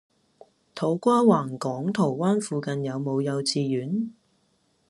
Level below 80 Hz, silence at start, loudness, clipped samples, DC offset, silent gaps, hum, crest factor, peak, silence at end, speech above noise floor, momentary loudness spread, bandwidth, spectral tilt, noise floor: -72 dBFS; 0.75 s; -25 LUFS; under 0.1%; under 0.1%; none; none; 20 dB; -6 dBFS; 0.75 s; 44 dB; 10 LU; 12 kHz; -6 dB/octave; -68 dBFS